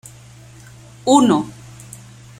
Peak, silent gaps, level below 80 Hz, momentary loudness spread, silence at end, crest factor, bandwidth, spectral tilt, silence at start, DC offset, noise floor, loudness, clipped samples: -2 dBFS; none; -54 dBFS; 26 LU; 0.9 s; 20 dB; 15.5 kHz; -5 dB/octave; 1.05 s; under 0.1%; -42 dBFS; -16 LUFS; under 0.1%